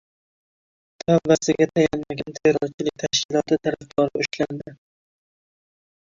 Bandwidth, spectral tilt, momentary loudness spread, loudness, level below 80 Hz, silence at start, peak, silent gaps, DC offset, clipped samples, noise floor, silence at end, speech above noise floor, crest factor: 7.8 kHz; -4.5 dB/octave; 11 LU; -22 LUFS; -56 dBFS; 1.1 s; -4 dBFS; 2.74-2.78 s, 3.25-3.29 s; under 0.1%; under 0.1%; under -90 dBFS; 1.4 s; over 68 dB; 20 dB